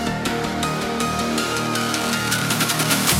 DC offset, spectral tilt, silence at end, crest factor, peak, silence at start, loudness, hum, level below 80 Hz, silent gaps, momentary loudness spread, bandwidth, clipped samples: under 0.1%; -3 dB/octave; 0 s; 20 dB; -2 dBFS; 0 s; -21 LUFS; none; -46 dBFS; none; 5 LU; 17 kHz; under 0.1%